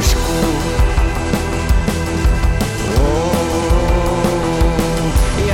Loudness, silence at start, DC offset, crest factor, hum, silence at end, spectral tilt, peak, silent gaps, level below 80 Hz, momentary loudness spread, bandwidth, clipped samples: -16 LUFS; 0 s; under 0.1%; 10 dB; none; 0 s; -5.5 dB/octave; -4 dBFS; none; -18 dBFS; 2 LU; 16.5 kHz; under 0.1%